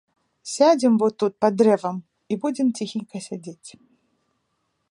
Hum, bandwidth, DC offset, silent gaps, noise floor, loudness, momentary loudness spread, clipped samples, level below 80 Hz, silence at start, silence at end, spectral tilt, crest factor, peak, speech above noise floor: none; 11.5 kHz; under 0.1%; none; -73 dBFS; -21 LUFS; 18 LU; under 0.1%; -72 dBFS; 0.45 s; 1.25 s; -5.5 dB/octave; 18 dB; -4 dBFS; 52 dB